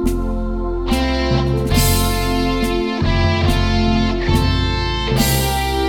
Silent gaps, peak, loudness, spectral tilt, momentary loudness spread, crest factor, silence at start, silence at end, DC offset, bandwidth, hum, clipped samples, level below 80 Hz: none; -2 dBFS; -17 LUFS; -5 dB/octave; 5 LU; 14 dB; 0 s; 0 s; 0.5%; 19 kHz; none; under 0.1%; -22 dBFS